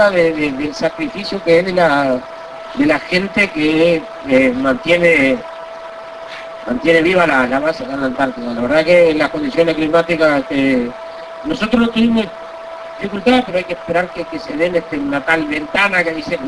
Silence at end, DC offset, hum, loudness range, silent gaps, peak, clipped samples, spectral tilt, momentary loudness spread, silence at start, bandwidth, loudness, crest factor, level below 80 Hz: 0 s; under 0.1%; none; 3 LU; none; 0 dBFS; under 0.1%; -5.5 dB/octave; 17 LU; 0 s; 11 kHz; -15 LUFS; 14 dB; -44 dBFS